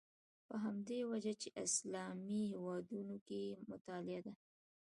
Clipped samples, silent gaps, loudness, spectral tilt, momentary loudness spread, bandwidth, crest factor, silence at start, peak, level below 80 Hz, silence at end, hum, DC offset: under 0.1%; 3.21-3.26 s, 3.81-3.85 s; -45 LUFS; -4 dB/octave; 10 LU; 11.5 kHz; 18 dB; 0.5 s; -26 dBFS; -86 dBFS; 0.6 s; none; under 0.1%